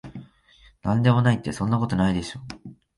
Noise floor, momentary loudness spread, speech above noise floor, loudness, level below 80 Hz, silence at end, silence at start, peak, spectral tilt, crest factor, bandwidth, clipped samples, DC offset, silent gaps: -56 dBFS; 22 LU; 34 dB; -23 LUFS; -46 dBFS; 0.25 s; 0.05 s; -8 dBFS; -7 dB/octave; 18 dB; 11.5 kHz; under 0.1%; under 0.1%; none